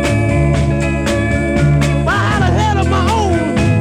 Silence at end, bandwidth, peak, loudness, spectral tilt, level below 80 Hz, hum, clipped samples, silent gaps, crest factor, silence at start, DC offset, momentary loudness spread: 0 s; 12.5 kHz; -2 dBFS; -14 LUFS; -6.5 dB/octave; -22 dBFS; none; under 0.1%; none; 12 dB; 0 s; under 0.1%; 2 LU